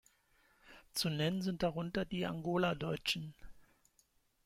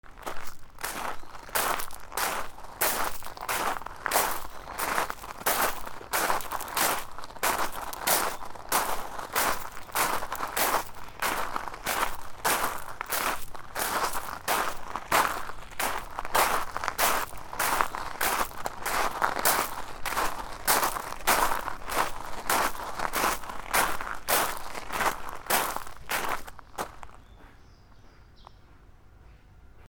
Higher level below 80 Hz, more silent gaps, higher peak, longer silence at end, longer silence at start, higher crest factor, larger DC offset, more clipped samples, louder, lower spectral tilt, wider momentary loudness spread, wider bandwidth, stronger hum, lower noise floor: second, -62 dBFS vs -46 dBFS; neither; second, -22 dBFS vs -4 dBFS; first, 0.85 s vs 0 s; first, 0.65 s vs 0.05 s; second, 18 dB vs 26 dB; neither; neither; second, -37 LUFS vs -29 LUFS; first, -5 dB/octave vs -1 dB/octave; second, 5 LU vs 12 LU; second, 16.5 kHz vs over 20 kHz; neither; first, -74 dBFS vs -52 dBFS